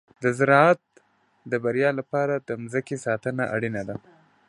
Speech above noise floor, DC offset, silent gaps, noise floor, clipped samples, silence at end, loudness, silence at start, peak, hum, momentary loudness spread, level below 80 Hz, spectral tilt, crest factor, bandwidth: 38 dB; under 0.1%; none; -61 dBFS; under 0.1%; 0.5 s; -24 LUFS; 0.2 s; -2 dBFS; none; 12 LU; -66 dBFS; -6.5 dB/octave; 22 dB; 11.5 kHz